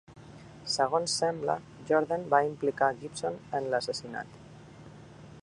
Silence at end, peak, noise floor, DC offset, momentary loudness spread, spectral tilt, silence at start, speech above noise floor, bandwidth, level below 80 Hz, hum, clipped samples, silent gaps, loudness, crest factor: 0 s; -8 dBFS; -50 dBFS; under 0.1%; 23 LU; -3.5 dB/octave; 0.1 s; 20 dB; 11.5 kHz; -64 dBFS; none; under 0.1%; none; -30 LUFS; 22 dB